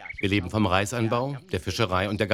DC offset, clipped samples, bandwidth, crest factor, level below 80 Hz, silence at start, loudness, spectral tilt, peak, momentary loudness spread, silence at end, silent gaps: under 0.1%; under 0.1%; 15.5 kHz; 22 dB; -50 dBFS; 0 s; -26 LUFS; -5.5 dB/octave; -4 dBFS; 7 LU; 0 s; none